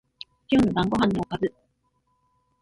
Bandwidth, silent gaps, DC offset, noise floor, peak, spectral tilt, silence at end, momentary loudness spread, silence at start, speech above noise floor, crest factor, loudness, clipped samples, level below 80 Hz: 11.5 kHz; none; under 0.1%; -71 dBFS; -10 dBFS; -7 dB/octave; 1.1 s; 17 LU; 0.5 s; 48 dB; 18 dB; -24 LUFS; under 0.1%; -50 dBFS